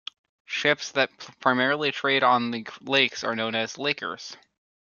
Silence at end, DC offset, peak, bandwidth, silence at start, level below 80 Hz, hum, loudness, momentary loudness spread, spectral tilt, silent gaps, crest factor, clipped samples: 0.5 s; under 0.1%; -4 dBFS; 7.2 kHz; 0.5 s; -74 dBFS; none; -24 LUFS; 12 LU; -3.5 dB/octave; none; 22 dB; under 0.1%